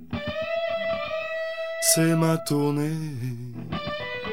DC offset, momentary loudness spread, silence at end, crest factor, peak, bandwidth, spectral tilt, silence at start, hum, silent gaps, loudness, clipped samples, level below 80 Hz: 0.5%; 13 LU; 0 s; 20 dB; -6 dBFS; 16 kHz; -4.5 dB/octave; 0 s; none; none; -26 LUFS; under 0.1%; -54 dBFS